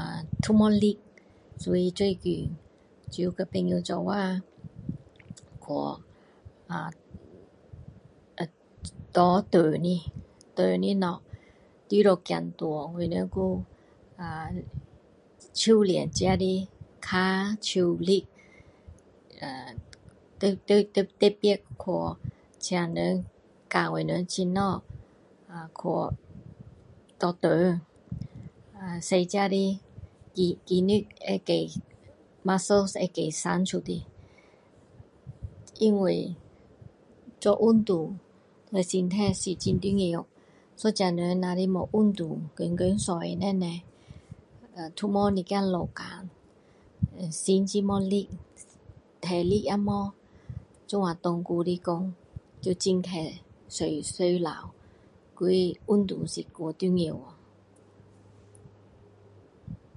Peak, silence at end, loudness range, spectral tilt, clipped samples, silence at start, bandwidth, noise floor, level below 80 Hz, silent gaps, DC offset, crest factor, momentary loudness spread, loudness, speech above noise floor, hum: -6 dBFS; 0.2 s; 5 LU; -6 dB/octave; under 0.1%; 0 s; 11.5 kHz; -58 dBFS; -52 dBFS; none; under 0.1%; 22 dB; 20 LU; -28 LUFS; 32 dB; none